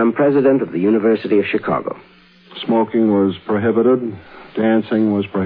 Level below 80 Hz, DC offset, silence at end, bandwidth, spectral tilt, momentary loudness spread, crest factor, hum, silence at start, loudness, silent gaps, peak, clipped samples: -60 dBFS; under 0.1%; 0 s; 5 kHz; -10.5 dB/octave; 14 LU; 12 dB; none; 0 s; -16 LUFS; none; -4 dBFS; under 0.1%